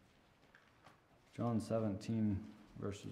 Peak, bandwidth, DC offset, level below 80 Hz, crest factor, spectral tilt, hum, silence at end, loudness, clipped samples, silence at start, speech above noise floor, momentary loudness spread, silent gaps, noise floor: -26 dBFS; 12 kHz; under 0.1%; -70 dBFS; 16 dB; -7.5 dB/octave; none; 0 s; -41 LUFS; under 0.1%; 0.55 s; 30 dB; 12 LU; none; -69 dBFS